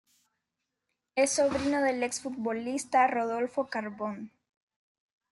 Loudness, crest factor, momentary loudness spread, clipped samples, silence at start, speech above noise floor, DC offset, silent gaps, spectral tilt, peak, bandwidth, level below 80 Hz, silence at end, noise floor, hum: -29 LUFS; 20 dB; 11 LU; under 0.1%; 1.15 s; 56 dB; under 0.1%; none; -3 dB/octave; -12 dBFS; 12 kHz; -66 dBFS; 1.05 s; -85 dBFS; none